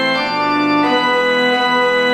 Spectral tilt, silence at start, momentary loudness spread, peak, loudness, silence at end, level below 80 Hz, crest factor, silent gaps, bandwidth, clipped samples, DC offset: -4 dB/octave; 0 s; 2 LU; -4 dBFS; -14 LUFS; 0 s; -56 dBFS; 12 dB; none; 16 kHz; under 0.1%; under 0.1%